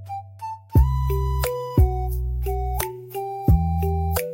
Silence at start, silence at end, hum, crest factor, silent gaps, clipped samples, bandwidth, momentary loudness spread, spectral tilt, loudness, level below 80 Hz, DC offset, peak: 0 s; 0 s; none; 16 dB; none; under 0.1%; 17 kHz; 12 LU; -7 dB/octave; -23 LUFS; -26 dBFS; under 0.1%; -6 dBFS